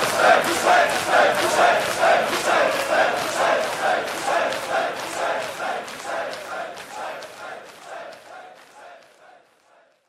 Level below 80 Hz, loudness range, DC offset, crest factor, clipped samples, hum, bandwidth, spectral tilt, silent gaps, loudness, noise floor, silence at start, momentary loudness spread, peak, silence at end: -62 dBFS; 17 LU; under 0.1%; 18 dB; under 0.1%; none; 16 kHz; -2 dB/octave; none; -20 LUFS; -58 dBFS; 0 s; 20 LU; -4 dBFS; 1.1 s